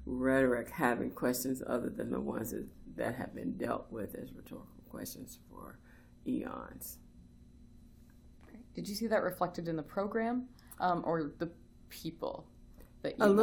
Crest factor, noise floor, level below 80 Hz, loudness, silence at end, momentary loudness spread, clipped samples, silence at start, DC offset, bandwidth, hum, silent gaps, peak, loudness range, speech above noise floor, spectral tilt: 22 dB; -58 dBFS; -58 dBFS; -36 LUFS; 0 s; 19 LU; under 0.1%; 0 s; under 0.1%; 19.5 kHz; none; none; -14 dBFS; 10 LU; 23 dB; -5.5 dB/octave